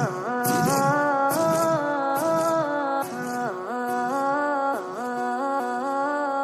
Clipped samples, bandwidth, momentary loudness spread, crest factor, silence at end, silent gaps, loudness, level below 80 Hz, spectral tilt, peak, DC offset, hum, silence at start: under 0.1%; 16 kHz; 7 LU; 14 dB; 0 s; none; -24 LUFS; -66 dBFS; -5 dB/octave; -10 dBFS; under 0.1%; none; 0 s